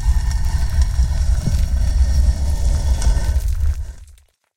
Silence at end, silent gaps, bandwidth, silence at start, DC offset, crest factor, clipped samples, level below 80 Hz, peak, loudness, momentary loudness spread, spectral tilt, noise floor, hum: 0.55 s; none; 13.5 kHz; 0 s; under 0.1%; 12 dB; under 0.1%; -18 dBFS; -4 dBFS; -20 LUFS; 4 LU; -5.5 dB/octave; -48 dBFS; none